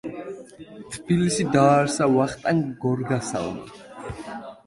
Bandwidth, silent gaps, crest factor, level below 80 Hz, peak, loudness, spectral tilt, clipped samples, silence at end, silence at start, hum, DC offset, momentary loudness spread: 11.5 kHz; none; 20 dB; -54 dBFS; -4 dBFS; -22 LUFS; -6 dB/octave; under 0.1%; 0.1 s; 0.05 s; none; under 0.1%; 20 LU